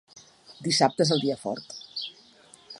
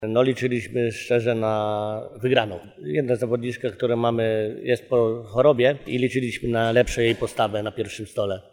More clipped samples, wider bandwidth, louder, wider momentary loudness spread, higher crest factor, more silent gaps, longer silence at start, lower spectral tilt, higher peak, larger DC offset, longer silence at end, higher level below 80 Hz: neither; second, 11.5 kHz vs 16.5 kHz; second, -26 LUFS vs -23 LUFS; first, 15 LU vs 8 LU; about the same, 24 dB vs 20 dB; neither; first, 0.15 s vs 0 s; second, -4 dB/octave vs -6 dB/octave; about the same, -6 dBFS vs -4 dBFS; neither; about the same, 0 s vs 0.1 s; second, -74 dBFS vs -48 dBFS